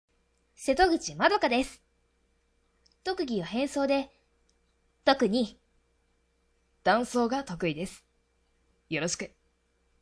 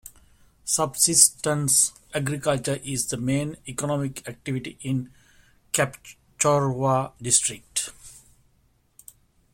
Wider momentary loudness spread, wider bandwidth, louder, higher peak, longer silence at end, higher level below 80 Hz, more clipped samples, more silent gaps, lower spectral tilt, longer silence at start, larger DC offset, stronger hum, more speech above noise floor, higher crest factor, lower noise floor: about the same, 12 LU vs 13 LU; second, 11 kHz vs 16.5 kHz; second, -29 LUFS vs -23 LUFS; second, -8 dBFS vs 0 dBFS; second, 0.75 s vs 1.35 s; about the same, -56 dBFS vs -56 dBFS; neither; neither; about the same, -4 dB/octave vs -3 dB/octave; first, 0.6 s vs 0.05 s; neither; neither; first, 44 dB vs 40 dB; about the same, 24 dB vs 26 dB; first, -71 dBFS vs -64 dBFS